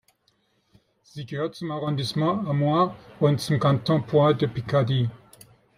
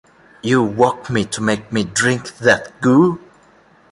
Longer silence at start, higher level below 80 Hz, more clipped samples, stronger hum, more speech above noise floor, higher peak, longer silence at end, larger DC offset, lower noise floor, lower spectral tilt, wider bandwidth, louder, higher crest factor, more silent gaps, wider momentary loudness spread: first, 1.15 s vs 0.45 s; second, -60 dBFS vs -52 dBFS; neither; neither; first, 45 dB vs 34 dB; second, -8 dBFS vs 0 dBFS; second, 0.6 s vs 0.75 s; neither; first, -68 dBFS vs -50 dBFS; first, -7 dB/octave vs -5 dB/octave; first, 14.5 kHz vs 11.5 kHz; second, -24 LUFS vs -17 LUFS; about the same, 18 dB vs 18 dB; neither; first, 10 LU vs 7 LU